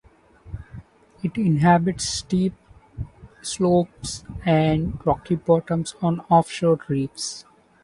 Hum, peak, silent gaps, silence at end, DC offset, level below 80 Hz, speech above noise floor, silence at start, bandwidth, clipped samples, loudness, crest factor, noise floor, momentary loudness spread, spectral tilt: none; -4 dBFS; none; 0.4 s; under 0.1%; -44 dBFS; 28 dB; 0.45 s; 11.5 kHz; under 0.1%; -22 LUFS; 20 dB; -49 dBFS; 19 LU; -6 dB/octave